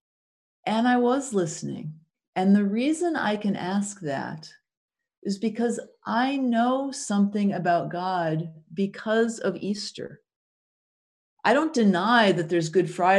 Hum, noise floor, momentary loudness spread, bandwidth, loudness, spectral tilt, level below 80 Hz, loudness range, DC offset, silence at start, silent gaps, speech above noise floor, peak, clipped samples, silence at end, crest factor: none; under -90 dBFS; 13 LU; 11 kHz; -25 LUFS; -5.5 dB/octave; -74 dBFS; 4 LU; under 0.1%; 0.65 s; 2.27-2.33 s, 4.77-4.88 s, 5.18-5.22 s, 10.36-11.37 s; over 66 dB; -6 dBFS; under 0.1%; 0 s; 18 dB